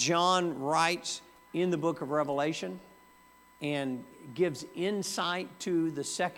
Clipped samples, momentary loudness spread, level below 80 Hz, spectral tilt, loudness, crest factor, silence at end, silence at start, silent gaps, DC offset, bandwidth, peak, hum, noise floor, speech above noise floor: under 0.1%; 12 LU; -74 dBFS; -4 dB/octave; -31 LUFS; 20 dB; 0 s; 0 s; none; under 0.1%; 17 kHz; -12 dBFS; none; -59 dBFS; 28 dB